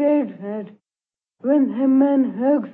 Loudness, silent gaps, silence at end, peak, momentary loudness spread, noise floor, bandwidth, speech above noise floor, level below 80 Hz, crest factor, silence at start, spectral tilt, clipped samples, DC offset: -19 LUFS; none; 0 s; -8 dBFS; 14 LU; under -90 dBFS; 3.3 kHz; over 73 dB; -76 dBFS; 12 dB; 0 s; -11 dB/octave; under 0.1%; under 0.1%